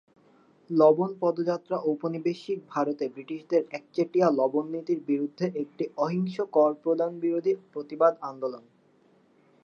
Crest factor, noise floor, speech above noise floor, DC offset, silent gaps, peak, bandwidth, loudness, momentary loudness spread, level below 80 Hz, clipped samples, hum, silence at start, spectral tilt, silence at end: 20 dB; -62 dBFS; 36 dB; under 0.1%; none; -8 dBFS; 7 kHz; -27 LUFS; 11 LU; -84 dBFS; under 0.1%; none; 0.7 s; -8 dB/octave; 1.05 s